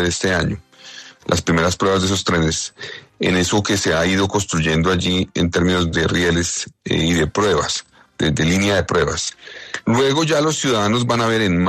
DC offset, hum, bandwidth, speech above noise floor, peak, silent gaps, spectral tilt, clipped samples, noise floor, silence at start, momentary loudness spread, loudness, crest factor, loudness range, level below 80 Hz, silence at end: under 0.1%; none; 13.5 kHz; 22 dB; -4 dBFS; none; -4.5 dB/octave; under 0.1%; -40 dBFS; 0 s; 9 LU; -18 LUFS; 14 dB; 1 LU; -42 dBFS; 0 s